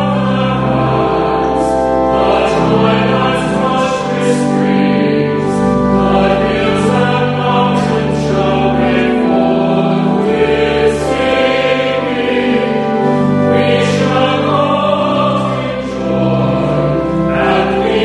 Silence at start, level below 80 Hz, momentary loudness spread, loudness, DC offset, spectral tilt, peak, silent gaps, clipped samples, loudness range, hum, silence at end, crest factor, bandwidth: 0 s; -34 dBFS; 3 LU; -12 LUFS; under 0.1%; -6.5 dB/octave; 0 dBFS; none; under 0.1%; 1 LU; none; 0 s; 12 dB; 11.5 kHz